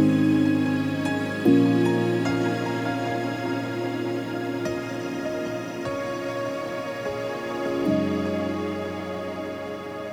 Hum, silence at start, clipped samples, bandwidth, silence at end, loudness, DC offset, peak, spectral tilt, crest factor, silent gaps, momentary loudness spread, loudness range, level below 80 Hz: none; 0 s; under 0.1%; 16 kHz; 0 s; -26 LUFS; under 0.1%; -8 dBFS; -6.5 dB/octave; 18 dB; none; 10 LU; 6 LU; -60 dBFS